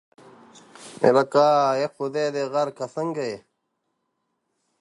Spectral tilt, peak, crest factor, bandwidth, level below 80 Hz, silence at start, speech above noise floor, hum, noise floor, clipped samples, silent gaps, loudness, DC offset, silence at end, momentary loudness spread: -5.5 dB/octave; -4 dBFS; 22 dB; 11.5 kHz; -74 dBFS; 0.8 s; 54 dB; none; -76 dBFS; under 0.1%; none; -22 LUFS; under 0.1%; 1.45 s; 13 LU